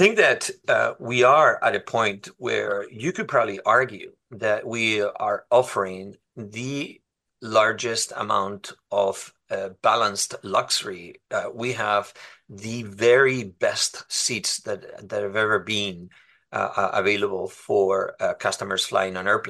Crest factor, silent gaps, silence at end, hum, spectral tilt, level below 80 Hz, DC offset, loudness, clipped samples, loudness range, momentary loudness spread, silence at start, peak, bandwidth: 20 dB; none; 0 s; none; -3 dB/octave; -70 dBFS; under 0.1%; -23 LUFS; under 0.1%; 4 LU; 14 LU; 0 s; -2 dBFS; 12.5 kHz